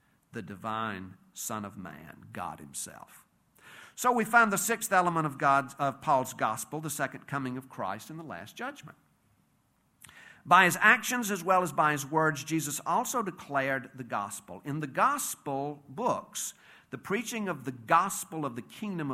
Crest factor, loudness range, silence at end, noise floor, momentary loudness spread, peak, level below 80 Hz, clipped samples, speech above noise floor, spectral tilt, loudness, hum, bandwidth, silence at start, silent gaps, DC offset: 24 dB; 13 LU; 0 s; -70 dBFS; 18 LU; -6 dBFS; -74 dBFS; under 0.1%; 40 dB; -3.5 dB/octave; -29 LUFS; none; 16 kHz; 0.35 s; none; under 0.1%